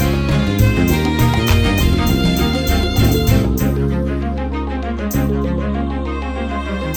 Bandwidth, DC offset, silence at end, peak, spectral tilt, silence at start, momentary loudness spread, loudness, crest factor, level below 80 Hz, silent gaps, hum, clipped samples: 19.5 kHz; under 0.1%; 0 s; 0 dBFS; -6 dB/octave; 0 s; 8 LU; -17 LUFS; 14 dB; -22 dBFS; none; none; under 0.1%